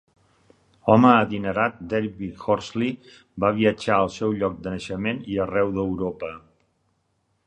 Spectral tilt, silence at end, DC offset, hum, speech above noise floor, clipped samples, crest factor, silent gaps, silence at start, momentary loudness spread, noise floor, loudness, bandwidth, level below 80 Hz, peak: -7 dB/octave; 1.1 s; under 0.1%; none; 48 dB; under 0.1%; 22 dB; none; 0.85 s; 14 LU; -70 dBFS; -23 LUFS; 9.4 kHz; -52 dBFS; -2 dBFS